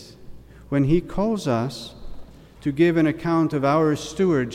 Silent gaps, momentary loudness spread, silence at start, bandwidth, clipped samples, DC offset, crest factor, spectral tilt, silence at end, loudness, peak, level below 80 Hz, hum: none; 11 LU; 0 s; 13 kHz; under 0.1%; under 0.1%; 16 dB; -7 dB/octave; 0 s; -22 LUFS; -6 dBFS; -44 dBFS; none